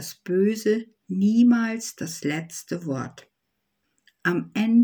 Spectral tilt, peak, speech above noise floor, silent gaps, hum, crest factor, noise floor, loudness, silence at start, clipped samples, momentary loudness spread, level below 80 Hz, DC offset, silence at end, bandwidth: -5.5 dB/octave; -8 dBFS; 55 dB; none; none; 16 dB; -78 dBFS; -24 LUFS; 0 s; under 0.1%; 13 LU; -72 dBFS; under 0.1%; 0 s; over 20 kHz